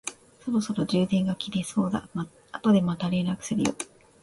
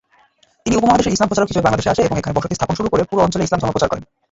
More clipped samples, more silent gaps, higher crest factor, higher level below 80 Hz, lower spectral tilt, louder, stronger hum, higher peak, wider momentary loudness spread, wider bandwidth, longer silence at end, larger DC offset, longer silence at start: neither; neither; about the same, 16 dB vs 16 dB; second, -60 dBFS vs -38 dBFS; about the same, -6 dB/octave vs -5.5 dB/octave; second, -27 LUFS vs -17 LUFS; neither; second, -12 dBFS vs 0 dBFS; first, 14 LU vs 7 LU; first, 11.5 kHz vs 8 kHz; about the same, 0.35 s vs 0.25 s; neither; second, 0.05 s vs 0.65 s